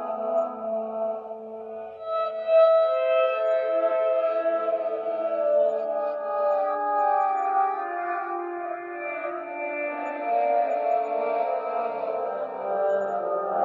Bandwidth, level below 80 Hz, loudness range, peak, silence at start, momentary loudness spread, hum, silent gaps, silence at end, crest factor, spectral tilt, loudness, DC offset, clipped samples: 4.8 kHz; -84 dBFS; 5 LU; -10 dBFS; 0 s; 9 LU; none; none; 0 s; 16 dB; -6 dB/octave; -25 LUFS; under 0.1%; under 0.1%